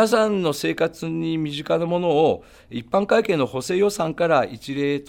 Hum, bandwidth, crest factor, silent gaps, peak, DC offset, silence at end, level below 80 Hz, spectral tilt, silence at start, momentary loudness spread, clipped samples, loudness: none; 18.5 kHz; 16 dB; none; -6 dBFS; under 0.1%; 0.05 s; -56 dBFS; -5.5 dB/octave; 0 s; 7 LU; under 0.1%; -22 LUFS